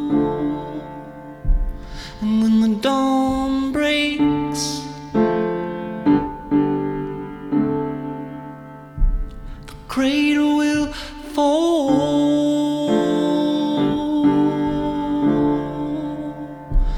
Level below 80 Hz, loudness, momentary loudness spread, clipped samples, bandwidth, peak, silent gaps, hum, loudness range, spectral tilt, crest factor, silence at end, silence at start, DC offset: -30 dBFS; -20 LUFS; 15 LU; under 0.1%; 13 kHz; -6 dBFS; none; none; 4 LU; -5.5 dB/octave; 14 dB; 0 s; 0 s; under 0.1%